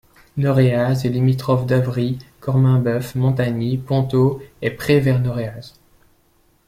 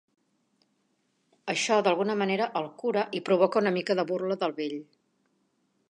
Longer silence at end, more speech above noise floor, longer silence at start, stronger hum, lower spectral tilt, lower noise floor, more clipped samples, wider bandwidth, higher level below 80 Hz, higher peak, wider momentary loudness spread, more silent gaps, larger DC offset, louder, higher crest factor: about the same, 1 s vs 1.05 s; second, 41 dB vs 46 dB; second, 0.35 s vs 1.45 s; neither; first, -8 dB/octave vs -4.5 dB/octave; second, -58 dBFS vs -73 dBFS; neither; first, 15 kHz vs 10.5 kHz; first, -48 dBFS vs -84 dBFS; first, -4 dBFS vs -8 dBFS; about the same, 10 LU vs 9 LU; neither; neither; first, -19 LUFS vs -27 LUFS; about the same, 16 dB vs 20 dB